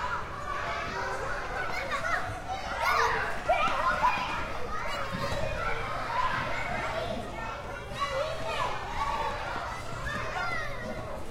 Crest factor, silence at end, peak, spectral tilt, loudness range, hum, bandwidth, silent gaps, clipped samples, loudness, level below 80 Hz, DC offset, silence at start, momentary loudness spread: 18 dB; 0 s; -14 dBFS; -4 dB/octave; 4 LU; none; 16.5 kHz; none; under 0.1%; -31 LUFS; -44 dBFS; under 0.1%; 0 s; 9 LU